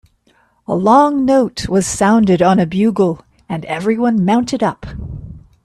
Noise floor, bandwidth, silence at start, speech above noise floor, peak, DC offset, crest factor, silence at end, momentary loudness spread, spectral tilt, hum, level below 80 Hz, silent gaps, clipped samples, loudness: -56 dBFS; 13 kHz; 0.7 s; 43 dB; 0 dBFS; under 0.1%; 14 dB; 0.25 s; 18 LU; -6 dB/octave; none; -40 dBFS; none; under 0.1%; -14 LUFS